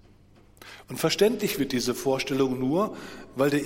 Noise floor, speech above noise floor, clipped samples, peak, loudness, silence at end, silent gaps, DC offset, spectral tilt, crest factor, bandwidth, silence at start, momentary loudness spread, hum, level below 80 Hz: -55 dBFS; 29 dB; under 0.1%; -10 dBFS; -26 LUFS; 0 s; none; under 0.1%; -4.5 dB/octave; 18 dB; 16.5 kHz; 0.6 s; 16 LU; none; -56 dBFS